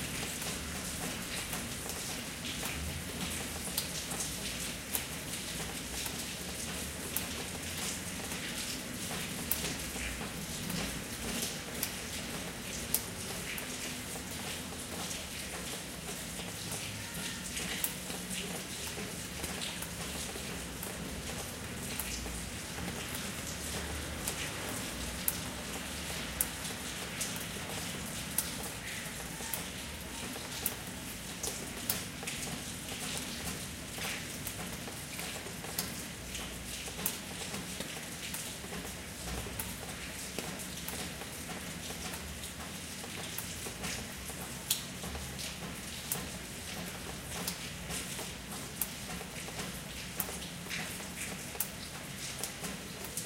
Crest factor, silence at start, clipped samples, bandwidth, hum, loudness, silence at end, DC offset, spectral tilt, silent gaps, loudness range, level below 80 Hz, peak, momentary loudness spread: 34 dB; 0 s; under 0.1%; 16.5 kHz; none; -38 LUFS; 0 s; under 0.1%; -2.5 dB/octave; none; 3 LU; -52 dBFS; -6 dBFS; 6 LU